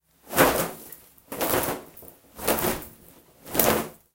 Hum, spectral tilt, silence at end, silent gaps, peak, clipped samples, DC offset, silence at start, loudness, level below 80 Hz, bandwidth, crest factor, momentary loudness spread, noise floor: none; -3 dB/octave; 0.2 s; none; 0 dBFS; under 0.1%; under 0.1%; 0.25 s; -25 LUFS; -48 dBFS; 17.5 kHz; 26 dB; 23 LU; -53 dBFS